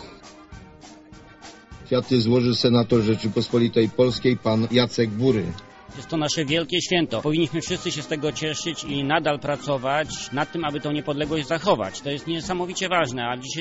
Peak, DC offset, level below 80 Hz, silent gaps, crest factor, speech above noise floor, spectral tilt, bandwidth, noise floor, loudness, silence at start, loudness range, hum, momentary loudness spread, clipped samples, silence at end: -6 dBFS; under 0.1%; -52 dBFS; none; 18 dB; 23 dB; -4.5 dB/octave; 8 kHz; -46 dBFS; -23 LUFS; 0 s; 5 LU; none; 8 LU; under 0.1%; 0 s